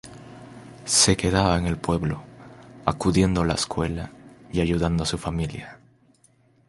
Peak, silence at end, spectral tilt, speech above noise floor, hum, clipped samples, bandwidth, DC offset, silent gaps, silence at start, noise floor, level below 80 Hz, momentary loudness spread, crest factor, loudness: -2 dBFS; 0.95 s; -4.5 dB/octave; 37 dB; none; under 0.1%; 11.5 kHz; under 0.1%; none; 0.05 s; -60 dBFS; -38 dBFS; 24 LU; 22 dB; -23 LUFS